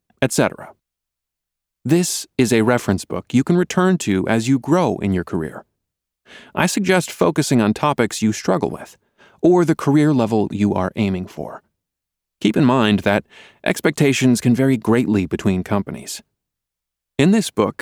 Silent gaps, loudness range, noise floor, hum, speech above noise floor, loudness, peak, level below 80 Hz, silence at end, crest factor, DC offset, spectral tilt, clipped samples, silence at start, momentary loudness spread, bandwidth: none; 3 LU; -83 dBFS; 60 Hz at -45 dBFS; 66 dB; -18 LUFS; -4 dBFS; -52 dBFS; 0.1 s; 16 dB; under 0.1%; -5.5 dB/octave; under 0.1%; 0.2 s; 11 LU; over 20 kHz